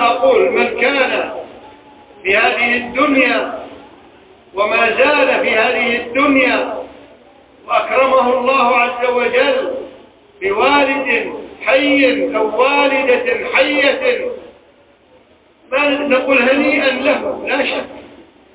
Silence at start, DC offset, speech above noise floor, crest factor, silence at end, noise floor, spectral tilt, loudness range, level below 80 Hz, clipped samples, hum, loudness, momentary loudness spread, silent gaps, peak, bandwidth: 0 s; under 0.1%; 35 dB; 14 dB; 0.35 s; -49 dBFS; -7 dB/octave; 2 LU; -52 dBFS; under 0.1%; none; -14 LUFS; 12 LU; none; 0 dBFS; 4 kHz